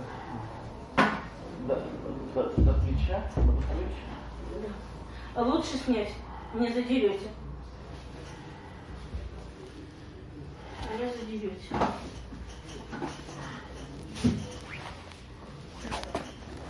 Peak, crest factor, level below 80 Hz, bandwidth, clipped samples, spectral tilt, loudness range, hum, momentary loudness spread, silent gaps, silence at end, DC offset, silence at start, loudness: -8 dBFS; 24 dB; -38 dBFS; 11.5 kHz; under 0.1%; -6.5 dB/octave; 10 LU; none; 18 LU; none; 0 s; under 0.1%; 0 s; -32 LUFS